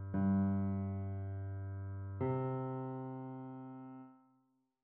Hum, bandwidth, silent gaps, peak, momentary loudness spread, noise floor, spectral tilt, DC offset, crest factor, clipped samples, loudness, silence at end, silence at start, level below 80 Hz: none; 3.3 kHz; none; -24 dBFS; 16 LU; -77 dBFS; -11 dB/octave; under 0.1%; 14 dB; under 0.1%; -40 LUFS; 0.65 s; 0 s; -72 dBFS